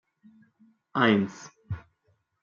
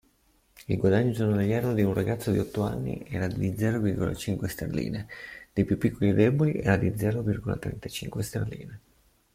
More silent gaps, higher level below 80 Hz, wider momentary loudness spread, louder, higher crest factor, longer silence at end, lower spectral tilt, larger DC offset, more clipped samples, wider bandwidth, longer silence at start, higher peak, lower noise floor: neither; second, -62 dBFS vs -50 dBFS; first, 17 LU vs 11 LU; first, -25 LUFS vs -28 LUFS; about the same, 22 dB vs 18 dB; about the same, 0.65 s vs 0.55 s; second, -6 dB/octave vs -7.5 dB/octave; neither; neither; second, 7.2 kHz vs 16 kHz; first, 0.95 s vs 0.7 s; about the same, -8 dBFS vs -8 dBFS; first, -71 dBFS vs -66 dBFS